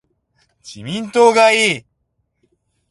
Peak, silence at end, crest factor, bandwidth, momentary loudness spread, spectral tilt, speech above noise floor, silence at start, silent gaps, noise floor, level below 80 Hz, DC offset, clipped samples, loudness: 0 dBFS; 1.1 s; 18 dB; 11.5 kHz; 16 LU; -3 dB/octave; 55 dB; 0.65 s; none; -69 dBFS; -62 dBFS; under 0.1%; under 0.1%; -14 LUFS